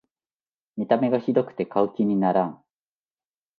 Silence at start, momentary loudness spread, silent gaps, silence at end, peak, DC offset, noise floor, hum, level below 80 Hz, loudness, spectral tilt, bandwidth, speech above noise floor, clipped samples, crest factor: 0.75 s; 9 LU; none; 1.05 s; -6 dBFS; under 0.1%; under -90 dBFS; none; -70 dBFS; -24 LUFS; -10 dB/octave; 4.9 kHz; over 67 dB; under 0.1%; 20 dB